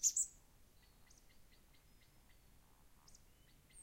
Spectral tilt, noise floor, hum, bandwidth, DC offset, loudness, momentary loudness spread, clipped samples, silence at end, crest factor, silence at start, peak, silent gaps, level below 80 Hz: 1 dB/octave; -67 dBFS; none; 16.5 kHz; under 0.1%; -39 LUFS; 29 LU; under 0.1%; 0 s; 26 dB; 0 s; -22 dBFS; none; -70 dBFS